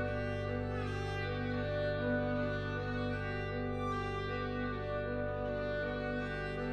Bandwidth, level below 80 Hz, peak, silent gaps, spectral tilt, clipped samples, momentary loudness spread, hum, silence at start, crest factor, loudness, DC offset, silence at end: 8.8 kHz; -48 dBFS; -22 dBFS; none; -7.5 dB/octave; under 0.1%; 3 LU; 50 Hz at -65 dBFS; 0 s; 14 dB; -37 LUFS; under 0.1%; 0 s